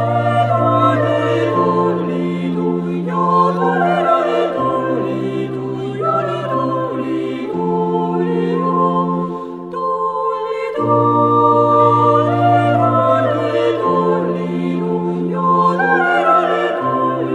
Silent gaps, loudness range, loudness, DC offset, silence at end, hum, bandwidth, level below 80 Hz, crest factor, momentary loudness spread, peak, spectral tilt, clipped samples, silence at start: none; 5 LU; -16 LUFS; under 0.1%; 0 s; none; 9.6 kHz; -58 dBFS; 14 dB; 8 LU; -2 dBFS; -8 dB/octave; under 0.1%; 0 s